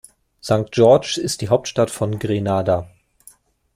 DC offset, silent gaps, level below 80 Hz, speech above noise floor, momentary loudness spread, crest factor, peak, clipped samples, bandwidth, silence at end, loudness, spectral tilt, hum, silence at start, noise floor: under 0.1%; none; -52 dBFS; 33 dB; 9 LU; 18 dB; -2 dBFS; under 0.1%; 15.5 kHz; 0.9 s; -19 LUFS; -5.5 dB/octave; none; 0.45 s; -51 dBFS